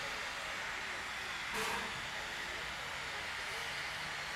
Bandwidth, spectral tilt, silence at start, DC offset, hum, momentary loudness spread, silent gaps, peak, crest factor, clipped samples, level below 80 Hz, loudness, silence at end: 16 kHz; -1.5 dB/octave; 0 s; under 0.1%; none; 3 LU; none; -26 dBFS; 16 dB; under 0.1%; -62 dBFS; -39 LUFS; 0 s